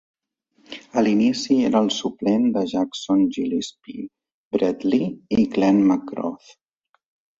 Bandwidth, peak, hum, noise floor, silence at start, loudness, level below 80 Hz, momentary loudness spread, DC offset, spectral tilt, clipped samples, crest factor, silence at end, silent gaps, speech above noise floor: 7.8 kHz; -6 dBFS; none; -64 dBFS; 0.7 s; -21 LUFS; -60 dBFS; 17 LU; under 0.1%; -5.5 dB/octave; under 0.1%; 16 dB; 1.05 s; 4.34-4.51 s; 43 dB